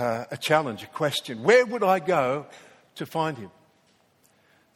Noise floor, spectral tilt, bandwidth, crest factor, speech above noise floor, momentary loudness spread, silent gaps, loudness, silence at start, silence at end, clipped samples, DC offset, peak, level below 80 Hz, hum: -64 dBFS; -4.5 dB/octave; 16.5 kHz; 20 dB; 39 dB; 18 LU; none; -24 LUFS; 0 s; 1.3 s; under 0.1%; under 0.1%; -6 dBFS; -72 dBFS; none